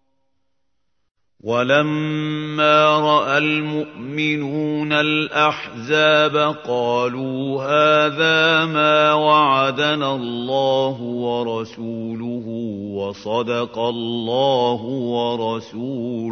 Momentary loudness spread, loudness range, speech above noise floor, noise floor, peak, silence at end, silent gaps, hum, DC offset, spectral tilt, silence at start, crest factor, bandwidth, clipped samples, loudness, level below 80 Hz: 13 LU; 7 LU; 57 dB; -76 dBFS; -2 dBFS; 0 s; none; none; under 0.1%; -5.5 dB/octave; 1.45 s; 18 dB; 6.6 kHz; under 0.1%; -19 LUFS; -66 dBFS